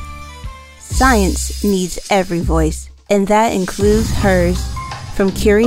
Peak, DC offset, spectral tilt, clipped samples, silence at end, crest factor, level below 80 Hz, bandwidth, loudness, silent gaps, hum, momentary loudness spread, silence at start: 0 dBFS; under 0.1%; -5 dB/octave; under 0.1%; 0 s; 14 dB; -24 dBFS; 16.5 kHz; -16 LUFS; none; none; 18 LU; 0 s